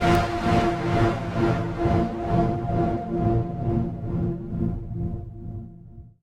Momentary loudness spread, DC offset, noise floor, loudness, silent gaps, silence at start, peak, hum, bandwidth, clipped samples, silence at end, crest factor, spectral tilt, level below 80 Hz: 14 LU; under 0.1%; -44 dBFS; -25 LUFS; none; 0 s; -8 dBFS; none; 15.5 kHz; under 0.1%; 0.15 s; 16 dB; -8 dB/octave; -36 dBFS